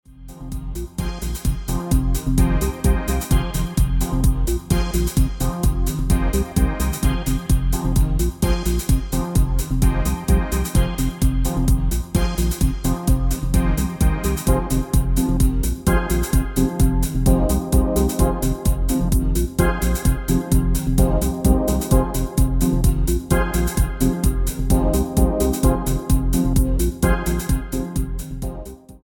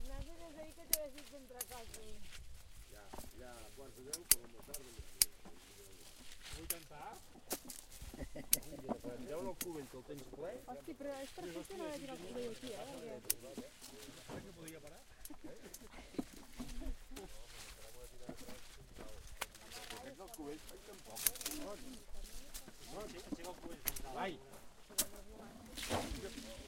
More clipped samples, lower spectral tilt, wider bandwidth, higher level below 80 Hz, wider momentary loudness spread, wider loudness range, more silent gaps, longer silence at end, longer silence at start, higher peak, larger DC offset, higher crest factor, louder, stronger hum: neither; first, -6 dB/octave vs -2 dB/octave; about the same, 17.5 kHz vs 16.5 kHz; first, -20 dBFS vs -56 dBFS; second, 5 LU vs 19 LU; second, 2 LU vs 12 LU; neither; about the same, 0.05 s vs 0 s; about the same, 0.1 s vs 0 s; first, -2 dBFS vs -8 dBFS; neither; second, 16 dB vs 38 dB; first, -21 LUFS vs -44 LUFS; neither